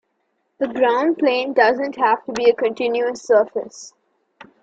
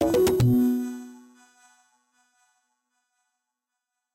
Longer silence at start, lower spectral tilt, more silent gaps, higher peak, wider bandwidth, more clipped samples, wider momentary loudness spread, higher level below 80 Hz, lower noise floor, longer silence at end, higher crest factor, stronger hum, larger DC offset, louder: first, 0.6 s vs 0 s; second, -3.5 dB/octave vs -7 dB/octave; neither; first, -2 dBFS vs -12 dBFS; second, 8 kHz vs 16.5 kHz; neither; second, 10 LU vs 20 LU; second, -66 dBFS vs -50 dBFS; second, -70 dBFS vs -85 dBFS; second, 0.2 s vs 3 s; about the same, 18 dB vs 16 dB; neither; neither; first, -19 LUFS vs -23 LUFS